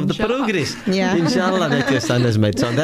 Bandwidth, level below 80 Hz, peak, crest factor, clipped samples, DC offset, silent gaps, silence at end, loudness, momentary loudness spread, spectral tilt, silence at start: 15 kHz; -46 dBFS; -4 dBFS; 14 dB; under 0.1%; under 0.1%; none; 0 s; -18 LUFS; 3 LU; -5.5 dB/octave; 0 s